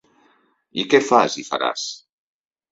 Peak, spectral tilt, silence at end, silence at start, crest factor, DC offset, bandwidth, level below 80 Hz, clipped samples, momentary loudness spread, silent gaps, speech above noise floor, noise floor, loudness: -2 dBFS; -3 dB/octave; 0.75 s; 0.75 s; 20 dB; under 0.1%; 8 kHz; -68 dBFS; under 0.1%; 15 LU; none; 42 dB; -61 dBFS; -20 LUFS